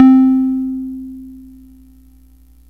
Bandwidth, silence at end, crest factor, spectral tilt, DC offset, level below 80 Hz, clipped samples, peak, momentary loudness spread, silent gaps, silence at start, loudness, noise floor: 3.3 kHz; 1.3 s; 16 dB; -8 dB/octave; 0.2%; -46 dBFS; under 0.1%; 0 dBFS; 24 LU; none; 0 s; -14 LUFS; -46 dBFS